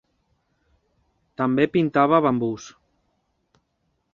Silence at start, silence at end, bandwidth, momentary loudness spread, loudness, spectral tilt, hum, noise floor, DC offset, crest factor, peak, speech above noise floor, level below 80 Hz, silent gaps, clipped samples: 1.4 s; 1.45 s; 7.2 kHz; 20 LU; -21 LUFS; -7 dB/octave; none; -72 dBFS; under 0.1%; 22 dB; -4 dBFS; 52 dB; -62 dBFS; none; under 0.1%